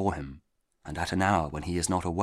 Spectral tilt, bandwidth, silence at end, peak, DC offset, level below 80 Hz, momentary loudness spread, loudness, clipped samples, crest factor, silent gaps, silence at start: -5 dB/octave; 14.5 kHz; 0 s; -10 dBFS; under 0.1%; -46 dBFS; 16 LU; -29 LUFS; under 0.1%; 20 dB; none; 0 s